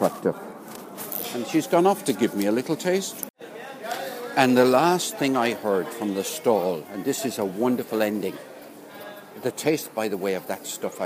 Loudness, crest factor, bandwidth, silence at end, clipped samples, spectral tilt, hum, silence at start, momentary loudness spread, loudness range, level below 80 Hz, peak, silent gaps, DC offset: -24 LUFS; 22 dB; 15.5 kHz; 0 s; under 0.1%; -4.5 dB/octave; none; 0 s; 19 LU; 5 LU; -74 dBFS; -2 dBFS; 3.30-3.34 s; under 0.1%